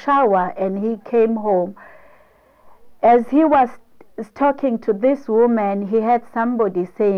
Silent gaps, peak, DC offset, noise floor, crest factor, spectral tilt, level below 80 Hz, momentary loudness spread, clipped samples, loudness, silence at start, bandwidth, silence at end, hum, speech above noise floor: none; -6 dBFS; under 0.1%; -53 dBFS; 12 dB; -9 dB/octave; -56 dBFS; 7 LU; under 0.1%; -18 LUFS; 0 s; 6.4 kHz; 0 s; none; 35 dB